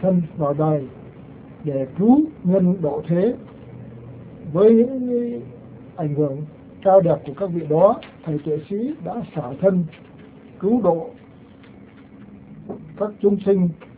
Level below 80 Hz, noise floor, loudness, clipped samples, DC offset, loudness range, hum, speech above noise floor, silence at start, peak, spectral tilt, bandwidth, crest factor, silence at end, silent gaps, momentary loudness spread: -54 dBFS; -45 dBFS; -20 LUFS; under 0.1%; under 0.1%; 5 LU; none; 25 dB; 0 s; -2 dBFS; -13 dB/octave; 4 kHz; 20 dB; 0.15 s; none; 23 LU